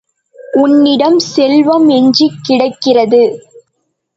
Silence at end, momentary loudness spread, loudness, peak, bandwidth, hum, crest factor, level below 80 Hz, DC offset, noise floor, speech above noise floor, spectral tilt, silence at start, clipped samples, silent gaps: 0.8 s; 5 LU; -10 LUFS; 0 dBFS; 8 kHz; none; 10 dB; -60 dBFS; under 0.1%; -66 dBFS; 58 dB; -5 dB/octave; 0.4 s; under 0.1%; none